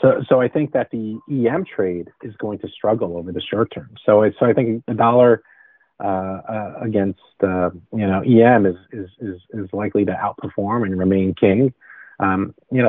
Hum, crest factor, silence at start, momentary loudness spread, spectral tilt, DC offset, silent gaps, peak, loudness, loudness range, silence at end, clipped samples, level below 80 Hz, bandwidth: none; 18 dB; 0 s; 14 LU; -6.5 dB/octave; under 0.1%; none; 0 dBFS; -19 LUFS; 3 LU; 0 s; under 0.1%; -56 dBFS; 3.9 kHz